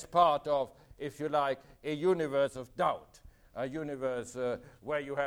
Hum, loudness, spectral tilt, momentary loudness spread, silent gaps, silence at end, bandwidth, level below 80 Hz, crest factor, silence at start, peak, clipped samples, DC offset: none; -33 LUFS; -5.5 dB/octave; 13 LU; none; 0 s; 16.5 kHz; -62 dBFS; 22 dB; 0 s; -12 dBFS; under 0.1%; under 0.1%